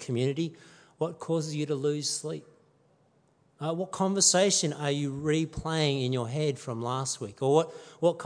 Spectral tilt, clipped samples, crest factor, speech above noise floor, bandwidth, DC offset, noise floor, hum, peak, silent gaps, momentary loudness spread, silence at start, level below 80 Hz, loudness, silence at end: -4 dB/octave; under 0.1%; 20 dB; 37 dB; 10.5 kHz; under 0.1%; -66 dBFS; none; -10 dBFS; none; 12 LU; 0 s; -60 dBFS; -29 LUFS; 0 s